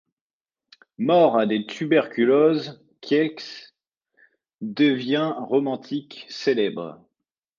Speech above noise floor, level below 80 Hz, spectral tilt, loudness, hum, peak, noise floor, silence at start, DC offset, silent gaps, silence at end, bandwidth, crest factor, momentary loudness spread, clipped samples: over 68 dB; -74 dBFS; -6.5 dB/octave; -22 LUFS; none; -6 dBFS; under -90 dBFS; 1 s; under 0.1%; 3.97-4.01 s; 0.65 s; 7.2 kHz; 18 dB; 19 LU; under 0.1%